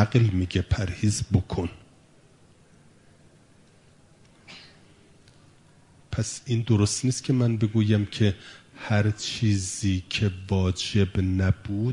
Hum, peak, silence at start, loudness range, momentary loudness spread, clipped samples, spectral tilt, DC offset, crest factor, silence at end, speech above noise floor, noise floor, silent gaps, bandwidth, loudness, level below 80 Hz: none; -4 dBFS; 0 s; 11 LU; 12 LU; under 0.1%; -5.5 dB/octave; under 0.1%; 22 dB; 0 s; 32 dB; -56 dBFS; none; 11 kHz; -25 LUFS; -48 dBFS